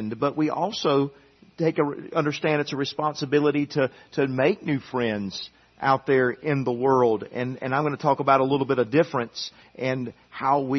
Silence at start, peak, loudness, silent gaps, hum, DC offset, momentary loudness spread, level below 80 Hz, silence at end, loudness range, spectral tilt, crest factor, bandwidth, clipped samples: 0 s; -4 dBFS; -24 LUFS; none; none; under 0.1%; 10 LU; -66 dBFS; 0 s; 3 LU; -6.5 dB/octave; 20 dB; 6.4 kHz; under 0.1%